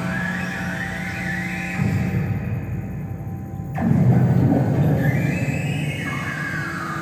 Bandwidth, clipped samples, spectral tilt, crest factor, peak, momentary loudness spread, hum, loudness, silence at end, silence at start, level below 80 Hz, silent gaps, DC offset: 15 kHz; under 0.1%; -7.5 dB/octave; 16 dB; -6 dBFS; 12 LU; none; -22 LUFS; 0 s; 0 s; -44 dBFS; none; under 0.1%